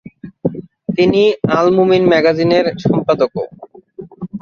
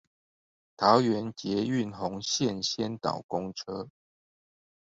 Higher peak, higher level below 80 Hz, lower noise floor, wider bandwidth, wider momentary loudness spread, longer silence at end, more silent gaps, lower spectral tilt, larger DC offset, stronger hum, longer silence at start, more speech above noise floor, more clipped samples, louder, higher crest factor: first, 0 dBFS vs -6 dBFS; first, -50 dBFS vs -66 dBFS; second, -35 dBFS vs under -90 dBFS; second, 7 kHz vs 7.8 kHz; about the same, 15 LU vs 14 LU; second, 0.05 s vs 1 s; second, none vs 3.24-3.29 s; first, -7.5 dB/octave vs -4.5 dB/octave; neither; neither; second, 0.25 s vs 0.8 s; second, 23 dB vs over 61 dB; neither; first, -14 LUFS vs -29 LUFS; second, 14 dB vs 24 dB